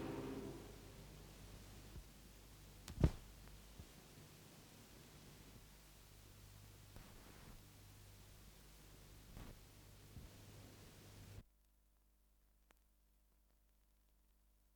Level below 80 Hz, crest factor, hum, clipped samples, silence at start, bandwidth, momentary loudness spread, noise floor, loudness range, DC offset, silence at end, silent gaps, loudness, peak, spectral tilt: -60 dBFS; 32 dB; 50 Hz at -70 dBFS; under 0.1%; 0 s; over 20 kHz; 13 LU; -75 dBFS; 14 LU; under 0.1%; 0 s; none; -54 LUFS; -22 dBFS; -6 dB/octave